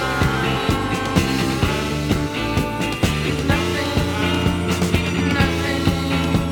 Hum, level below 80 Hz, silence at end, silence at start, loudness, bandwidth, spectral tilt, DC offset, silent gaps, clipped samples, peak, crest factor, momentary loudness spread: none; -32 dBFS; 0 s; 0 s; -20 LUFS; 19.5 kHz; -5.5 dB/octave; under 0.1%; none; under 0.1%; -2 dBFS; 16 dB; 3 LU